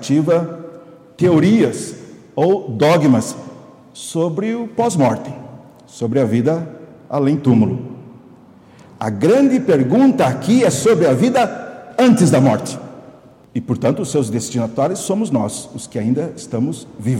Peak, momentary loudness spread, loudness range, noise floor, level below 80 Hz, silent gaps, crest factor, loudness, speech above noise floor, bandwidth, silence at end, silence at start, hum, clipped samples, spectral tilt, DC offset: -2 dBFS; 16 LU; 6 LU; -44 dBFS; -58 dBFS; none; 16 dB; -16 LUFS; 29 dB; 15.5 kHz; 0 s; 0 s; none; under 0.1%; -6.5 dB/octave; under 0.1%